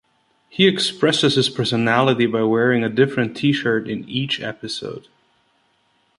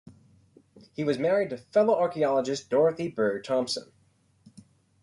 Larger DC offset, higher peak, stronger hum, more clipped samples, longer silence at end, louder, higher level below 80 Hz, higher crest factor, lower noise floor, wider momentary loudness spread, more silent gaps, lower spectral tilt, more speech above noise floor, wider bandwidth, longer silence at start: neither; first, -2 dBFS vs -12 dBFS; neither; neither; about the same, 1.2 s vs 1.2 s; first, -19 LUFS vs -26 LUFS; first, -60 dBFS vs -70 dBFS; about the same, 18 dB vs 16 dB; about the same, -63 dBFS vs -62 dBFS; first, 12 LU vs 8 LU; neither; about the same, -5 dB/octave vs -5 dB/octave; first, 44 dB vs 37 dB; about the same, 11.5 kHz vs 11.5 kHz; second, 0.55 s vs 1 s